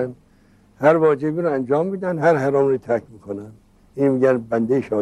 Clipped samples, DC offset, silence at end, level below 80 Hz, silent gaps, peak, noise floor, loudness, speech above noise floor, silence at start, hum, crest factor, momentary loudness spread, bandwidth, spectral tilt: under 0.1%; under 0.1%; 0 s; -60 dBFS; none; -2 dBFS; -54 dBFS; -19 LUFS; 35 dB; 0 s; 50 Hz at -55 dBFS; 18 dB; 16 LU; 11.5 kHz; -8.5 dB/octave